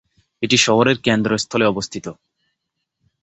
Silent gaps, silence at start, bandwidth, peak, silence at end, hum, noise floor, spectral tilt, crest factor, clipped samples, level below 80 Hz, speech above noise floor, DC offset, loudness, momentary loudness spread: none; 0.4 s; 8.4 kHz; -2 dBFS; 1.1 s; none; -77 dBFS; -4 dB/octave; 18 dB; under 0.1%; -54 dBFS; 59 dB; under 0.1%; -17 LUFS; 15 LU